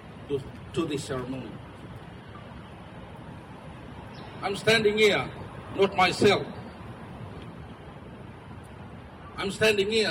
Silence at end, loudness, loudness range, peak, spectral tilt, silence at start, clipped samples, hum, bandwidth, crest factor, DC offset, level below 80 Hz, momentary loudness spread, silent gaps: 0 s; -26 LUFS; 15 LU; -12 dBFS; -4.5 dB/octave; 0 s; under 0.1%; none; 16 kHz; 18 dB; under 0.1%; -54 dBFS; 22 LU; none